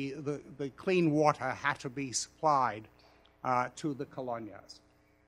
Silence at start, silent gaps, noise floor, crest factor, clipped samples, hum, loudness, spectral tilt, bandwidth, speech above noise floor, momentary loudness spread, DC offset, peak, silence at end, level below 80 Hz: 0 s; none; -52 dBFS; 24 dB; under 0.1%; none; -33 LUFS; -5 dB/octave; 13 kHz; 19 dB; 13 LU; under 0.1%; -10 dBFS; 0.55 s; -70 dBFS